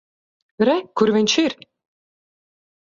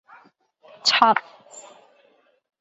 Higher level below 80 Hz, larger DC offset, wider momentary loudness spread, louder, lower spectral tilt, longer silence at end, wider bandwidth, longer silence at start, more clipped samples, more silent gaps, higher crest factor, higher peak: first, -64 dBFS vs -76 dBFS; neither; second, 7 LU vs 27 LU; about the same, -19 LUFS vs -19 LUFS; first, -4 dB/octave vs -1 dB/octave; first, 1.45 s vs 1 s; about the same, 7.6 kHz vs 8.2 kHz; second, 0.6 s vs 0.85 s; neither; neither; about the same, 20 dB vs 24 dB; about the same, -2 dBFS vs -2 dBFS